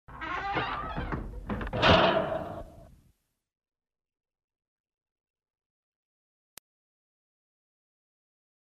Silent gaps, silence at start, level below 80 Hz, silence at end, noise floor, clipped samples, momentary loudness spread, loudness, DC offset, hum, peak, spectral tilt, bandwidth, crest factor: none; 0.1 s; -48 dBFS; 5.9 s; -69 dBFS; under 0.1%; 16 LU; -28 LUFS; under 0.1%; none; -8 dBFS; -5.5 dB/octave; 13 kHz; 26 dB